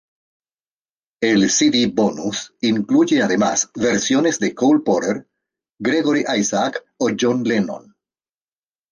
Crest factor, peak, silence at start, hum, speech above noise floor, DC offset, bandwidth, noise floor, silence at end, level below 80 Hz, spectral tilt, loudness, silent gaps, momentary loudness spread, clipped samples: 14 dB; -4 dBFS; 1.2 s; none; over 72 dB; under 0.1%; 10 kHz; under -90 dBFS; 1.15 s; -60 dBFS; -3.5 dB/octave; -18 LUFS; none; 9 LU; under 0.1%